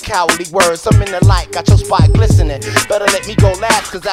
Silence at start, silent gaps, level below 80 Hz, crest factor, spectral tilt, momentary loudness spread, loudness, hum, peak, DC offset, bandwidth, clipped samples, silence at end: 0 s; none; -20 dBFS; 12 dB; -5 dB/octave; 4 LU; -12 LUFS; none; 0 dBFS; under 0.1%; 15.5 kHz; 0.3%; 0 s